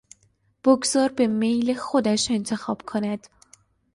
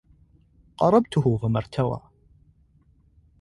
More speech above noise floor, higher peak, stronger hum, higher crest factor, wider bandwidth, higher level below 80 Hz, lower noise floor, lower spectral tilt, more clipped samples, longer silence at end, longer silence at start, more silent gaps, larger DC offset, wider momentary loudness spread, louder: first, 42 dB vs 38 dB; about the same, -6 dBFS vs -6 dBFS; neither; about the same, 18 dB vs 20 dB; about the same, 11.5 kHz vs 11.5 kHz; second, -62 dBFS vs -52 dBFS; first, -65 dBFS vs -60 dBFS; second, -4 dB/octave vs -8.5 dB/octave; neither; second, 0.8 s vs 1.45 s; second, 0.65 s vs 0.8 s; neither; neither; about the same, 9 LU vs 8 LU; about the same, -23 LUFS vs -23 LUFS